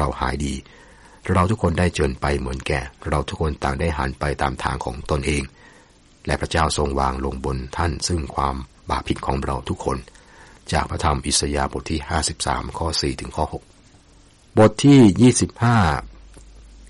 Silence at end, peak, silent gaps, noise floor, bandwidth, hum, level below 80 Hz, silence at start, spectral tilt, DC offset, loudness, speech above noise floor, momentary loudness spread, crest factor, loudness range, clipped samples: 0 s; -4 dBFS; none; -51 dBFS; 11.5 kHz; none; -32 dBFS; 0 s; -5 dB/octave; under 0.1%; -21 LUFS; 31 dB; 11 LU; 16 dB; 7 LU; under 0.1%